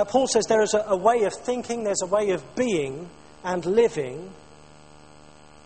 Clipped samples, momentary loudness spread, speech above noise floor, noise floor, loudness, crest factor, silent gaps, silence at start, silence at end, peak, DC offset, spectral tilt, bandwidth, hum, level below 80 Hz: under 0.1%; 15 LU; 27 dB; -50 dBFS; -24 LUFS; 18 dB; none; 0 s; 1.3 s; -6 dBFS; 0.2%; -4 dB/octave; 8.8 kHz; 50 Hz at -60 dBFS; -58 dBFS